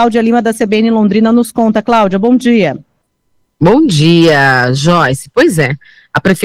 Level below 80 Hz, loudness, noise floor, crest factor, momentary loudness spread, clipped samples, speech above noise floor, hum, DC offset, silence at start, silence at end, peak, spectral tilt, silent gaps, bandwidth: -42 dBFS; -10 LUFS; -61 dBFS; 10 dB; 7 LU; under 0.1%; 52 dB; none; under 0.1%; 0 s; 0 s; 0 dBFS; -6 dB/octave; none; 15.5 kHz